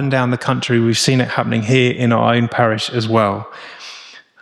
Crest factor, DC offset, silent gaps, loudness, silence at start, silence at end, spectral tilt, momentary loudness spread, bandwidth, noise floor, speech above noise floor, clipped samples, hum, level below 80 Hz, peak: 14 dB; under 0.1%; none; -16 LUFS; 0 s; 0.25 s; -5.5 dB/octave; 18 LU; 13 kHz; -39 dBFS; 24 dB; under 0.1%; none; -56 dBFS; -2 dBFS